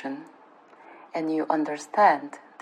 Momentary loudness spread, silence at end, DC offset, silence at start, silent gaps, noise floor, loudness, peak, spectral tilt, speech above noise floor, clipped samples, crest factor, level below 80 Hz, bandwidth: 17 LU; 0.25 s; under 0.1%; 0 s; none; -53 dBFS; -25 LUFS; -6 dBFS; -5 dB/octave; 28 dB; under 0.1%; 20 dB; under -90 dBFS; 10.5 kHz